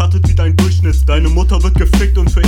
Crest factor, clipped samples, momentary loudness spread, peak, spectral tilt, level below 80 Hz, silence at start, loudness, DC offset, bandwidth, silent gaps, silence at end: 8 dB; under 0.1%; 1 LU; -2 dBFS; -6.5 dB/octave; -12 dBFS; 0 s; -12 LUFS; under 0.1%; 13 kHz; none; 0 s